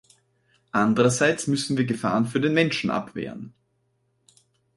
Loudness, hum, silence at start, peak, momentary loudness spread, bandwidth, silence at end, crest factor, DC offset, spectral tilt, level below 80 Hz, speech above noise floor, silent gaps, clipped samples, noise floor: -23 LUFS; none; 0.75 s; -6 dBFS; 14 LU; 11.5 kHz; 1.25 s; 20 dB; under 0.1%; -5 dB/octave; -62 dBFS; 48 dB; none; under 0.1%; -70 dBFS